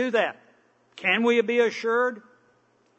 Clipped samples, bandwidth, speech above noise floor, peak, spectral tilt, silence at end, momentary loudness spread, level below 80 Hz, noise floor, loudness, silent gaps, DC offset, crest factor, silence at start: under 0.1%; 8.2 kHz; 40 dB; -8 dBFS; -4.5 dB/octave; 0.8 s; 8 LU; -88 dBFS; -64 dBFS; -24 LUFS; none; under 0.1%; 16 dB; 0 s